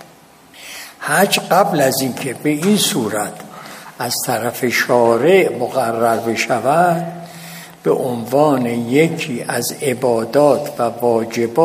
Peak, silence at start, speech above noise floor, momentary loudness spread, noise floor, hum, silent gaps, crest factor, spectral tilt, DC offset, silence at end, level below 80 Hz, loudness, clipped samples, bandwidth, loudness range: 0 dBFS; 0 s; 29 dB; 18 LU; -45 dBFS; none; none; 16 dB; -4.5 dB/octave; under 0.1%; 0 s; -64 dBFS; -16 LUFS; under 0.1%; 15.5 kHz; 2 LU